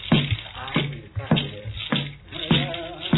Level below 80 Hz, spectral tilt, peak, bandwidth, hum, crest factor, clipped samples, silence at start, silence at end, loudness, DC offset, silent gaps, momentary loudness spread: -44 dBFS; -9 dB/octave; -6 dBFS; 4.1 kHz; none; 18 dB; under 0.1%; 0 s; 0 s; -25 LUFS; under 0.1%; none; 11 LU